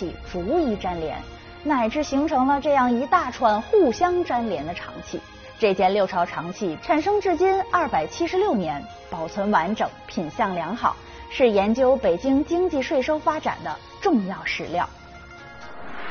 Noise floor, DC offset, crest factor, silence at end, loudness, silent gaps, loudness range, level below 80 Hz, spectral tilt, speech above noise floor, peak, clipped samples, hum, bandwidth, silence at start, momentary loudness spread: -42 dBFS; under 0.1%; 18 dB; 0 s; -23 LUFS; none; 3 LU; -46 dBFS; -4 dB/octave; 20 dB; -6 dBFS; under 0.1%; none; 6.6 kHz; 0 s; 15 LU